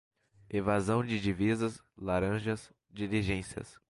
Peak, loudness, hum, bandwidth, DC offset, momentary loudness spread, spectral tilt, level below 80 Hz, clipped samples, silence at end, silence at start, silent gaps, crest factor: -16 dBFS; -33 LUFS; none; 11.5 kHz; under 0.1%; 12 LU; -6.5 dB/octave; -52 dBFS; under 0.1%; 0.2 s; 0.5 s; none; 16 dB